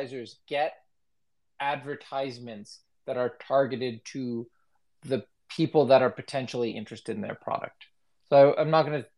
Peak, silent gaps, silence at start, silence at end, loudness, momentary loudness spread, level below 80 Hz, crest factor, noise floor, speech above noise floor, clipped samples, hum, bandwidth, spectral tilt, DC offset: -8 dBFS; none; 0 s; 0.15 s; -27 LUFS; 19 LU; -80 dBFS; 20 dB; -85 dBFS; 58 dB; under 0.1%; none; 11 kHz; -6.5 dB/octave; under 0.1%